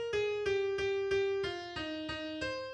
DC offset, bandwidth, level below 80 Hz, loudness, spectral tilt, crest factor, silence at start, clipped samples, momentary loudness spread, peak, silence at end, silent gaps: under 0.1%; 9.4 kHz; -60 dBFS; -35 LUFS; -4.5 dB/octave; 12 dB; 0 s; under 0.1%; 7 LU; -22 dBFS; 0 s; none